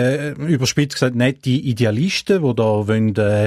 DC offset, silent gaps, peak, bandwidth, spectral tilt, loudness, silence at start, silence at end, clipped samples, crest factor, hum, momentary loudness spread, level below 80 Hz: under 0.1%; none; -2 dBFS; 15 kHz; -6 dB/octave; -18 LUFS; 0 s; 0 s; under 0.1%; 14 dB; none; 3 LU; -52 dBFS